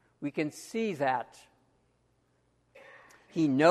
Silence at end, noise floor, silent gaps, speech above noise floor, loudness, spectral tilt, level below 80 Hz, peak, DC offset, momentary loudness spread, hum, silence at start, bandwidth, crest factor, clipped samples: 0 s; -71 dBFS; none; 43 dB; -31 LUFS; -6 dB/octave; -76 dBFS; -8 dBFS; under 0.1%; 20 LU; none; 0.2 s; 13 kHz; 24 dB; under 0.1%